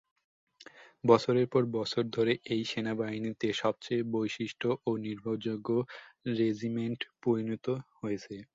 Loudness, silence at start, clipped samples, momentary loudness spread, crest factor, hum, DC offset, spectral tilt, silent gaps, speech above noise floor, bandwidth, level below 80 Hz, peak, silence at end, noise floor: -32 LUFS; 0.6 s; under 0.1%; 9 LU; 24 dB; none; under 0.1%; -6.5 dB/octave; none; 24 dB; 7.8 kHz; -70 dBFS; -8 dBFS; 0.1 s; -55 dBFS